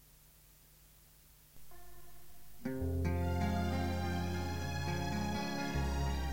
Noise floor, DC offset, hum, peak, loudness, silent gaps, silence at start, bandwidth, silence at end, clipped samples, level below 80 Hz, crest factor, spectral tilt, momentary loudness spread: -62 dBFS; 0.4%; none; -22 dBFS; -37 LUFS; none; 0 s; 16.5 kHz; 0 s; under 0.1%; -46 dBFS; 16 dB; -6 dB/octave; 22 LU